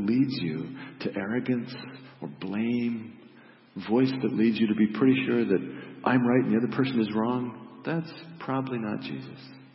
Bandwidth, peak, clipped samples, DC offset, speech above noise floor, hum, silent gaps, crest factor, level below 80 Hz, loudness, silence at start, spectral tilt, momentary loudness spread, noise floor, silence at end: 5.8 kHz; -10 dBFS; under 0.1%; under 0.1%; 26 dB; none; none; 18 dB; -72 dBFS; -27 LUFS; 0 s; -11 dB/octave; 17 LU; -53 dBFS; 0.1 s